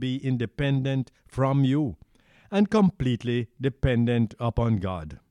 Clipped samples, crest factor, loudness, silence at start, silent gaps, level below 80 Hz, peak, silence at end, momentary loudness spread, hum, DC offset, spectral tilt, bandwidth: under 0.1%; 16 dB; -26 LUFS; 0 s; none; -42 dBFS; -10 dBFS; 0.15 s; 8 LU; none; under 0.1%; -8 dB/octave; 10.5 kHz